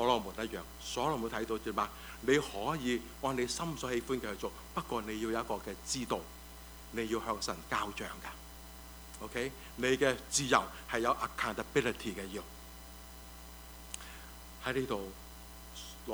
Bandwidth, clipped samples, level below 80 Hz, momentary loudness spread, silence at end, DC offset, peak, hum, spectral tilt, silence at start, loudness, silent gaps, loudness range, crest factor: over 20 kHz; under 0.1%; -54 dBFS; 19 LU; 0 s; under 0.1%; -12 dBFS; none; -3.5 dB/octave; 0 s; -36 LUFS; none; 8 LU; 26 dB